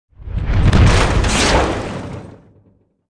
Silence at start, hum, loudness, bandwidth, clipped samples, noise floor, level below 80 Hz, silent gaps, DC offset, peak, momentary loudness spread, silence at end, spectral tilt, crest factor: 0.2 s; none; -15 LUFS; 11 kHz; under 0.1%; -55 dBFS; -20 dBFS; none; under 0.1%; 0 dBFS; 16 LU; 0.8 s; -5 dB/octave; 16 dB